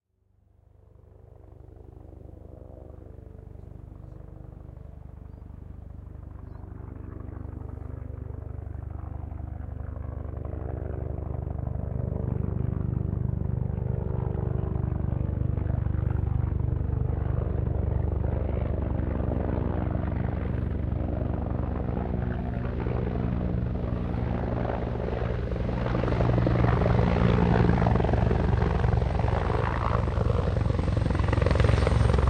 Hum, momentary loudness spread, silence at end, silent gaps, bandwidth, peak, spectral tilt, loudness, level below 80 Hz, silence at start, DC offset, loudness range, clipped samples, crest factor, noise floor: 50 Hz at -50 dBFS; 21 LU; 0 s; none; 9.2 kHz; -8 dBFS; -9 dB/octave; -28 LUFS; -34 dBFS; 1.4 s; under 0.1%; 21 LU; under 0.1%; 20 dB; -66 dBFS